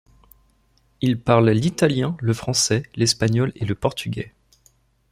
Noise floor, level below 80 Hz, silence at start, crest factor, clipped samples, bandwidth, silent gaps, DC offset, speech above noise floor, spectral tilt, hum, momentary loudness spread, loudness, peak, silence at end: -61 dBFS; -50 dBFS; 1 s; 20 dB; under 0.1%; 15.5 kHz; none; under 0.1%; 41 dB; -5 dB/octave; none; 10 LU; -21 LUFS; -2 dBFS; 0.85 s